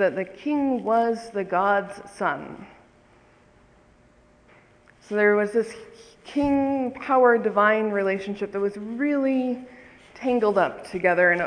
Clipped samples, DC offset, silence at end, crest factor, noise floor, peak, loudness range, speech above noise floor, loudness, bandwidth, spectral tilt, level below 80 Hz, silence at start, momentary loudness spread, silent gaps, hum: under 0.1%; under 0.1%; 0 s; 18 dB; -57 dBFS; -6 dBFS; 7 LU; 34 dB; -23 LUFS; 10.5 kHz; -6.5 dB/octave; -60 dBFS; 0 s; 11 LU; none; none